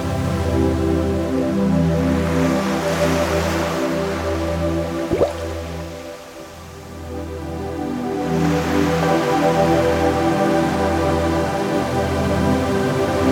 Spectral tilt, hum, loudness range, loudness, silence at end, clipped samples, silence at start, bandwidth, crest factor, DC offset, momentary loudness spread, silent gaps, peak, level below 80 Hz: -6.5 dB/octave; none; 7 LU; -19 LUFS; 0 s; under 0.1%; 0 s; 17 kHz; 14 dB; under 0.1%; 12 LU; none; -4 dBFS; -34 dBFS